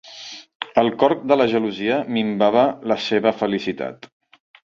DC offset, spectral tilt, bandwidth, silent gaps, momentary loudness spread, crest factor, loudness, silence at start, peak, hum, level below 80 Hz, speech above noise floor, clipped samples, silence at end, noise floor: under 0.1%; -6 dB/octave; 7.4 kHz; 0.55-0.60 s; 14 LU; 18 dB; -20 LUFS; 0.05 s; -2 dBFS; none; -62 dBFS; 20 dB; under 0.1%; 0.8 s; -39 dBFS